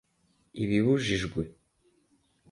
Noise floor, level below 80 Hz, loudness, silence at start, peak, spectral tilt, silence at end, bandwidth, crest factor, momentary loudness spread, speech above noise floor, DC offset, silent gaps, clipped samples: -70 dBFS; -52 dBFS; -28 LUFS; 0.55 s; -12 dBFS; -6 dB/octave; 1 s; 11.5 kHz; 18 dB; 15 LU; 43 dB; under 0.1%; none; under 0.1%